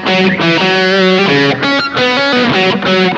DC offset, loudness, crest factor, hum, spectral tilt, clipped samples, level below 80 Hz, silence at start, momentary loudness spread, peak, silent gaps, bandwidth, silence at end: under 0.1%; -10 LUFS; 10 dB; none; -5 dB/octave; under 0.1%; -50 dBFS; 0 s; 2 LU; 0 dBFS; none; 8.2 kHz; 0 s